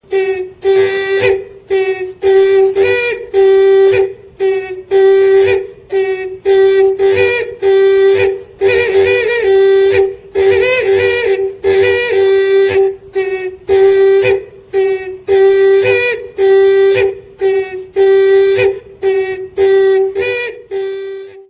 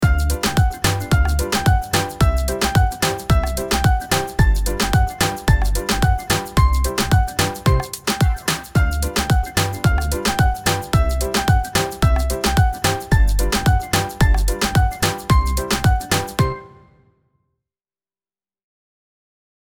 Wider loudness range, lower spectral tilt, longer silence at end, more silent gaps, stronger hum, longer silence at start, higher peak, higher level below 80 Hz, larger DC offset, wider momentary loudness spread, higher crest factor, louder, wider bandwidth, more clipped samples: about the same, 2 LU vs 3 LU; first, -9 dB/octave vs -4.5 dB/octave; second, 0.1 s vs 3 s; neither; neither; about the same, 0.1 s vs 0 s; about the same, 0 dBFS vs -2 dBFS; second, -44 dBFS vs -22 dBFS; neither; first, 9 LU vs 3 LU; about the same, 12 dB vs 16 dB; first, -12 LUFS vs -19 LUFS; second, 4 kHz vs over 20 kHz; neither